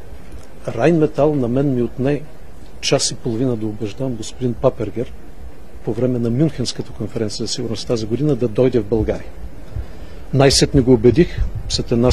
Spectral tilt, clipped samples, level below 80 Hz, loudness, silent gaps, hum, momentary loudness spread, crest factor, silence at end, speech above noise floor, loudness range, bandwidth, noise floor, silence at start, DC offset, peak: -5.5 dB/octave; under 0.1%; -34 dBFS; -18 LUFS; none; none; 18 LU; 18 dB; 0 s; 20 dB; 6 LU; 13.5 kHz; -37 dBFS; 0.05 s; 4%; 0 dBFS